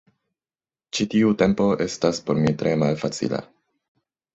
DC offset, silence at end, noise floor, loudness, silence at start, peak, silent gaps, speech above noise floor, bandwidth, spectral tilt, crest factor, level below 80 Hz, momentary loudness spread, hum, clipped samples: under 0.1%; 0.9 s; under -90 dBFS; -22 LUFS; 0.95 s; -4 dBFS; none; over 69 dB; 8.2 kHz; -6 dB/octave; 20 dB; -56 dBFS; 8 LU; none; under 0.1%